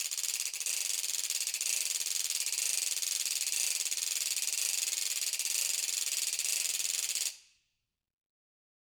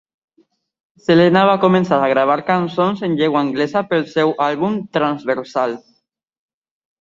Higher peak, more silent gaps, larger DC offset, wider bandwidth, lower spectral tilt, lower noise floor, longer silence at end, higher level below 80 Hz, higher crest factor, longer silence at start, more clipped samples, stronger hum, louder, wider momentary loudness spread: second, -12 dBFS vs -2 dBFS; neither; neither; first, over 20 kHz vs 7.6 kHz; second, 5.5 dB/octave vs -7 dB/octave; first, -84 dBFS vs -67 dBFS; first, 1.55 s vs 1.2 s; second, -86 dBFS vs -60 dBFS; first, 22 dB vs 16 dB; second, 0 s vs 1.1 s; neither; neither; second, -31 LUFS vs -16 LUFS; second, 2 LU vs 8 LU